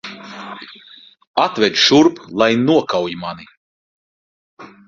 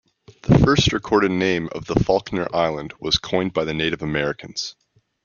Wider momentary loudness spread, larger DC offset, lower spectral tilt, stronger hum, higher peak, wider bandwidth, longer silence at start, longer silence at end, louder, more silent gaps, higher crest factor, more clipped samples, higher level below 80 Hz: first, 21 LU vs 12 LU; neither; second, -4 dB/octave vs -5.5 dB/octave; neither; about the same, 0 dBFS vs -2 dBFS; about the same, 7.4 kHz vs 7.2 kHz; second, 0.05 s vs 0.45 s; second, 0.2 s vs 0.55 s; first, -15 LUFS vs -21 LUFS; first, 1.27-1.34 s, 3.57-4.57 s vs none; about the same, 18 dB vs 20 dB; neither; second, -58 dBFS vs -40 dBFS